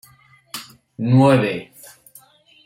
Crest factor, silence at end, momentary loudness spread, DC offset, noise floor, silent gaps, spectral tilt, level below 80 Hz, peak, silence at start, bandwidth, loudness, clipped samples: 18 dB; 1.05 s; 24 LU; under 0.1%; -52 dBFS; none; -7 dB/octave; -62 dBFS; -4 dBFS; 0.55 s; 16 kHz; -17 LUFS; under 0.1%